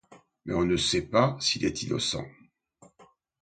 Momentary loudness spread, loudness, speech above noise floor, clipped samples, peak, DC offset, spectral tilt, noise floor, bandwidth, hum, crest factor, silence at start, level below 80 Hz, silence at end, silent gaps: 11 LU; -27 LUFS; 33 dB; under 0.1%; -8 dBFS; under 0.1%; -4 dB/octave; -60 dBFS; 9.4 kHz; none; 22 dB; 0.1 s; -52 dBFS; 0.4 s; none